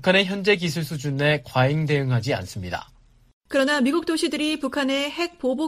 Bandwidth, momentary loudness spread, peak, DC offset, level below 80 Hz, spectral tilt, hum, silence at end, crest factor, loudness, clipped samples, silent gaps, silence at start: 15.5 kHz; 8 LU; -4 dBFS; under 0.1%; -54 dBFS; -5.5 dB/octave; none; 0 s; 18 dB; -23 LUFS; under 0.1%; 3.33-3.41 s; 0 s